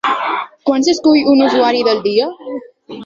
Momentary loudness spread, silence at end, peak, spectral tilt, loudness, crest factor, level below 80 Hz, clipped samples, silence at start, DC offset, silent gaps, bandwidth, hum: 17 LU; 0 s; 0 dBFS; -4 dB/octave; -13 LUFS; 14 dB; -58 dBFS; under 0.1%; 0.05 s; under 0.1%; none; 7.6 kHz; none